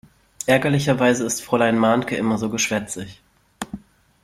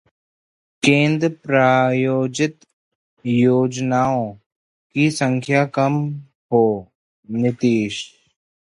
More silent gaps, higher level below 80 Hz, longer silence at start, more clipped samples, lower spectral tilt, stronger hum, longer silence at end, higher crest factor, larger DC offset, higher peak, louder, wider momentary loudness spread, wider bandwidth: second, none vs 2.73-3.17 s, 4.46-4.90 s, 6.35-6.49 s, 6.95-7.23 s; first, -54 dBFS vs -60 dBFS; second, 0.4 s vs 0.85 s; neither; second, -4.5 dB/octave vs -6 dB/octave; neither; second, 0.45 s vs 0.65 s; about the same, 20 dB vs 18 dB; neither; about the same, -2 dBFS vs 0 dBFS; about the same, -20 LUFS vs -19 LUFS; first, 16 LU vs 13 LU; first, 15.5 kHz vs 11.5 kHz